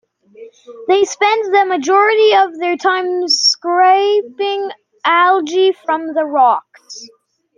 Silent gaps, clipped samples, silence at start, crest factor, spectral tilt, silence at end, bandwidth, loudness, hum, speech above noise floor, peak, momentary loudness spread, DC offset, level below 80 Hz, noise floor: none; under 0.1%; 0.4 s; 12 dB; -0.5 dB/octave; 0.5 s; 9.6 kHz; -13 LUFS; none; 26 dB; -2 dBFS; 11 LU; under 0.1%; -70 dBFS; -39 dBFS